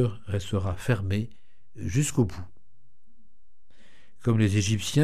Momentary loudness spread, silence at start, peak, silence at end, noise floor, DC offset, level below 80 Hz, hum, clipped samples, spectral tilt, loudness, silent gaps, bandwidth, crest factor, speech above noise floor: 15 LU; 0 s; -8 dBFS; 0 s; -67 dBFS; 1%; -50 dBFS; none; under 0.1%; -5.5 dB/octave; -27 LUFS; none; 14.5 kHz; 20 dB; 41 dB